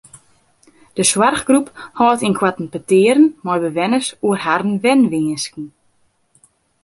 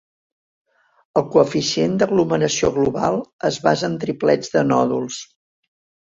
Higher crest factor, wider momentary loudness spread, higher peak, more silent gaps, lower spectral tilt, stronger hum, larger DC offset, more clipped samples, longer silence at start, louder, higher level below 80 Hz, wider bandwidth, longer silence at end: about the same, 16 dB vs 18 dB; first, 13 LU vs 6 LU; about the same, 0 dBFS vs -2 dBFS; second, none vs 3.33-3.39 s; about the same, -4 dB/octave vs -5 dB/octave; neither; neither; neither; second, 0.95 s vs 1.15 s; first, -16 LUFS vs -19 LUFS; about the same, -56 dBFS vs -52 dBFS; first, 11.5 kHz vs 7.8 kHz; first, 1.15 s vs 0.85 s